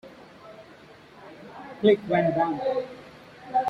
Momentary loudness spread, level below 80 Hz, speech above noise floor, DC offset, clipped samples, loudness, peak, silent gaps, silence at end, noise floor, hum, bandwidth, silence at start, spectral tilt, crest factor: 25 LU; -66 dBFS; 27 dB; under 0.1%; under 0.1%; -24 LUFS; -8 dBFS; none; 0 s; -50 dBFS; none; 7.2 kHz; 0.05 s; -7.5 dB/octave; 20 dB